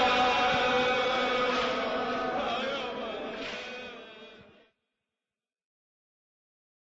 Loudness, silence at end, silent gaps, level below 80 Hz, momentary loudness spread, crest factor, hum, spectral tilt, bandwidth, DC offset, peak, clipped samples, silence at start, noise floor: -28 LUFS; 2.4 s; none; -60 dBFS; 16 LU; 16 dB; none; -3.5 dB/octave; 8 kHz; under 0.1%; -16 dBFS; under 0.1%; 0 s; under -90 dBFS